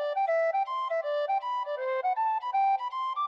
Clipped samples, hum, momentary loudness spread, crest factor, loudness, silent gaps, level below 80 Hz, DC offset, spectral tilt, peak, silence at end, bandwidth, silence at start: under 0.1%; none; 5 LU; 10 dB; -29 LUFS; none; -84 dBFS; under 0.1%; 0.5 dB/octave; -20 dBFS; 0 s; 7.4 kHz; 0 s